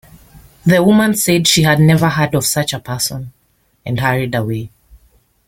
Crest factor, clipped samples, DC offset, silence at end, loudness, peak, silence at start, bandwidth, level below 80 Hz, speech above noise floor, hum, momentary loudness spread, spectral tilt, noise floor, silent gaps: 14 dB; under 0.1%; under 0.1%; 0.8 s; -14 LUFS; 0 dBFS; 0.35 s; 17 kHz; -46 dBFS; 43 dB; none; 14 LU; -4.5 dB/octave; -57 dBFS; none